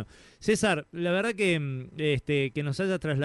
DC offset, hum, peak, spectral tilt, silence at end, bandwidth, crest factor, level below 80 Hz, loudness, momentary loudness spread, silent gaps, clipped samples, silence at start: under 0.1%; none; -10 dBFS; -5.5 dB/octave; 0 s; 11.5 kHz; 18 dB; -56 dBFS; -28 LUFS; 6 LU; none; under 0.1%; 0 s